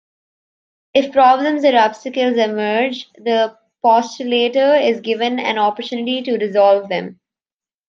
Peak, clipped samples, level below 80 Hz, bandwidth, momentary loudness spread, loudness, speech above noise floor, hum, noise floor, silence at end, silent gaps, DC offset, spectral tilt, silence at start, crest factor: 0 dBFS; under 0.1%; -70 dBFS; 7.4 kHz; 9 LU; -16 LUFS; over 74 dB; none; under -90 dBFS; 0.75 s; none; under 0.1%; -4.5 dB/octave; 0.95 s; 16 dB